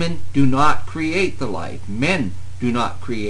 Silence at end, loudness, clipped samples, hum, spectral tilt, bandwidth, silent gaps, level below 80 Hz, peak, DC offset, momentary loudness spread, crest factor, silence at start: 0 s; -21 LUFS; under 0.1%; none; -6 dB/octave; 10 kHz; none; -40 dBFS; 0 dBFS; 6%; 10 LU; 16 dB; 0 s